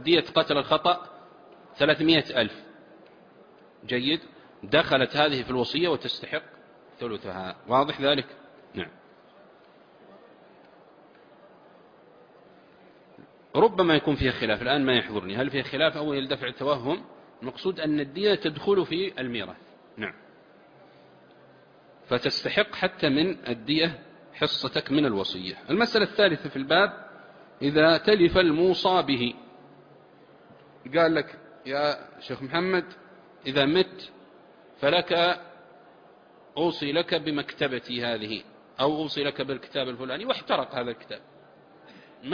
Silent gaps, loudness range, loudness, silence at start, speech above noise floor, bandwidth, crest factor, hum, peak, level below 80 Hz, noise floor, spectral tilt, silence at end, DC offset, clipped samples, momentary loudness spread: none; 7 LU; -25 LUFS; 0 s; 29 dB; 5.2 kHz; 20 dB; none; -6 dBFS; -56 dBFS; -55 dBFS; -6.5 dB/octave; 0 s; under 0.1%; under 0.1%; 15 LU